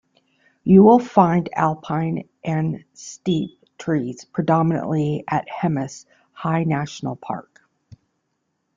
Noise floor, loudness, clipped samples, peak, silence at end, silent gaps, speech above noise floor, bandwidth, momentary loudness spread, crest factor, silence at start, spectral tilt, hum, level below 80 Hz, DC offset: -73 dBFS; -20 LUFS; under 0.1%; -2 dBFS; 1.35 s; none; 54 dB; 7.6 kHz; 17 LU; 18 dB; 0.65 s; -7.5 dB/octave; none; -58 dBFS; under 0.1%